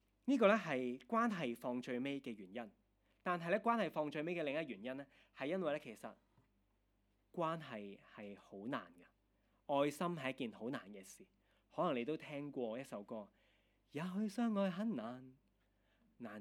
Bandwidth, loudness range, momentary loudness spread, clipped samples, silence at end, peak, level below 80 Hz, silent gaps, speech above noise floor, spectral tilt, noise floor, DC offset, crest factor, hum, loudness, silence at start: 16 kHz; 5 LU; 17 LU; under 0.1%; 0 s; -18 dBFS; -82 dBFS; none; 38 dB; -6 dB/octave; -80 dBFS; under 0.1%; 24 dB; none; -41 LUFS; 0.25 s